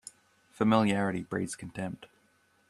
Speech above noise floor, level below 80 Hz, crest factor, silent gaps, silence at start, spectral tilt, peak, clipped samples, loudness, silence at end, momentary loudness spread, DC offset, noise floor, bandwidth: 39 dB; -66 dBFS; 22 dB; none; 0.6 s; -6 dB/octave; -10 dBFS; under 0.1%; -30 LUFS; 0.65 s; 16 LU; under 0.1%; -68 dBFS; 12.5 kHz